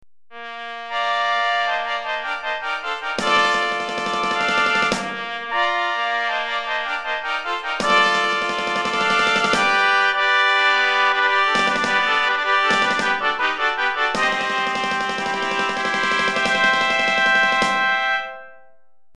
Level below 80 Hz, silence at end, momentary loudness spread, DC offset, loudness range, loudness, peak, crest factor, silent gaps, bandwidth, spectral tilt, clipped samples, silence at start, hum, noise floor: -56 dBFS; 0 s; 9 LU; under 0.1%; 4 LU; -19 LUFS; -4 dBFS; 16 dB; none; 12.5 kHz; -2 dB/octave; under 0.1%; 0 s; none; -60 dBFS